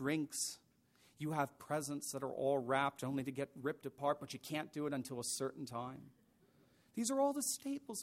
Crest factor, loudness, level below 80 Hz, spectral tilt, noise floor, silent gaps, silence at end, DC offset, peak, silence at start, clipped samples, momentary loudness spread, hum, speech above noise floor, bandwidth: 20 dB; -40 LUFS; -80 dBFS; -4 dB/octave; -71 dBFS; none; 0 s; under 0.1%; -20 dBFS; 0 s; under 0.1%; 10 LU; none; 31 dB; 16 kHz